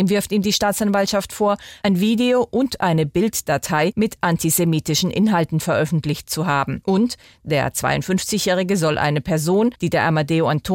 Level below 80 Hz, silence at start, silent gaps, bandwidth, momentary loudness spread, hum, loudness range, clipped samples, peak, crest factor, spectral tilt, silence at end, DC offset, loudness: -48 dBFS; 0 s; none; 17 kHz; 4 LU; none; 1 LU; under 0.1%; -4 dBFS; 14 dB; -5 dB/octave; 0 s; under 0.1%; -19 LUFS